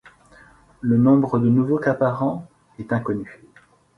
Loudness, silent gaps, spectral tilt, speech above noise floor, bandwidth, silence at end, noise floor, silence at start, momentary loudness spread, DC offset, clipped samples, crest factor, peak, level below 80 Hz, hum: -20 LUFS; none; -10.5 dB/octave; 35 dB; 6 kHz; 0.65 s; -55 dBFS; 0.85 s; 15 LU; under 0.1%; under 0.1%; 18 dB; -4 dBFS; -56 dBFS; none